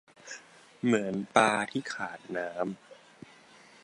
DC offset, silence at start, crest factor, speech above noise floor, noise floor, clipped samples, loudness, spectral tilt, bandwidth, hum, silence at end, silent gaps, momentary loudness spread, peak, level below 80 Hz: under 0.1%; 0.25 s; 26 dB; 27 dB; -56 dBFS; under 0.1%; -30 LUFS; -4.5 dB/octave; 11 kHz; none; 0.9 s; none; 21 LU; -6 dBFS; -74 dBFS